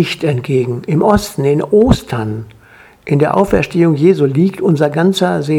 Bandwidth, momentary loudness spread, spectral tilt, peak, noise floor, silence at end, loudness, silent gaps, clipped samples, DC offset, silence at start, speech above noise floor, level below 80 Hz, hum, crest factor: 17 kHz; 7 LU; -7 dB/octave; 0 dBFS; -43 dBFS; 0 s; -13 LUFS; none; under 0.1%; under 0.1%; 0 s; 30 dB; -34 dBFS; none; 12 dB